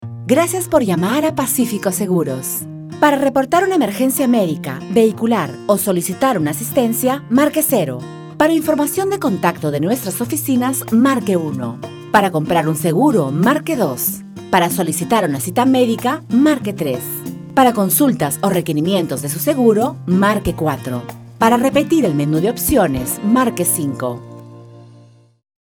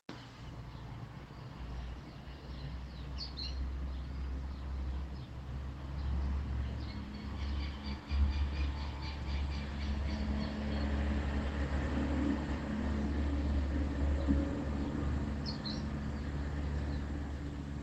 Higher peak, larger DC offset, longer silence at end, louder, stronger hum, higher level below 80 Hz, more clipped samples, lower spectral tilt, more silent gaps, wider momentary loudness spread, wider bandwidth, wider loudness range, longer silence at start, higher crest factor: first, 0 dBFS vs -16 dBFS; neither; first, 0.8 s vs 0 s; first, -16 LUFS vs -38 LUFS; neither; second, -46 dBFS vs -40 dBFS; neither; second, -5 dB/octave vs -7 dB/octave; neither; second, 8 LU vs 12 LU; first, over 20 kHz vs 8 kHz; second, 1 LU vs 8 LU; about the same, 0 s vs 0.1 s; about the same, 16 dB vs 20 dB